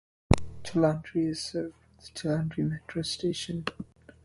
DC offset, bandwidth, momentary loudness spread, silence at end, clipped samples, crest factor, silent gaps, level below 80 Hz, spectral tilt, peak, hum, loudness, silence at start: under 0.1%; 11.5 kHz; 12 LU; 0.15 s; under 0.1%; 26 dB; none; -44 dBFS; -6 dB/octave; -4 dBFS; none; -31 LUFS; 0.3 s